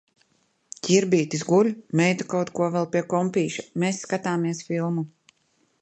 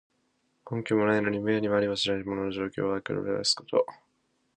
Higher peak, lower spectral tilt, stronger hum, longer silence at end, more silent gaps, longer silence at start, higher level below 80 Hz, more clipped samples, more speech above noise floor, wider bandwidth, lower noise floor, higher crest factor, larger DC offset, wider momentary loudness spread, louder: first, -6 dBFS vs -10 dBFS; about the same, -5.5 dB/octave vs -4.5 dB/octave; neither; first, 0.75 s vs 0.6 s; neither; first, 0.85 s vs 0.65 s; second, -68 dBFS vs -62 dBFS; neither; about the same, 44 dB vs 45 dB; second, 8.8 kHz vs 11 kHz; second, -68 dBFS vs -73 dBFS; about the same, 18 dB vs 18 dB; neither; about the same, 7 LU vs 7 LU; first, -24 LUFS vs -28 LUFS